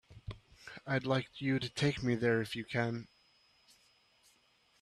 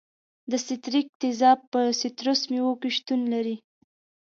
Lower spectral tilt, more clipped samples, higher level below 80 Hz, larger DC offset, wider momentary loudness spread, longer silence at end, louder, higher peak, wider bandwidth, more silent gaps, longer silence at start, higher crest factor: first, -6 dB/octave vs -3 dB/octave; neither; first, -64 dBFS vs -82 dBFS; neither; first, 18 LU vs 10 LU; first, 1.75 s vs 0.75 s; second, -35 LUFS vs -25 LUFS; second, -18 dBFS vs -8 dBFS; first, 13 kHz vs 7.6 kHz; second, none vs 1.09-1.20 s, 1.67-1.72 s; second, 0.1 s vs 0.5 s; about the same, 20 dB vs 18 dB